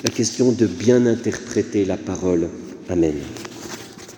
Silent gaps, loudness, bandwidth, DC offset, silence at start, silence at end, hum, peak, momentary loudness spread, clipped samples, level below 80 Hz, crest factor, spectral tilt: none; -20 LUFS; over 20 kHz; under 0.1%; 0 s; 0 s; none; -2 dBFS; 17 LU; under 0.1%; -50 dBFS; 20 dB; -5.5 dB/octave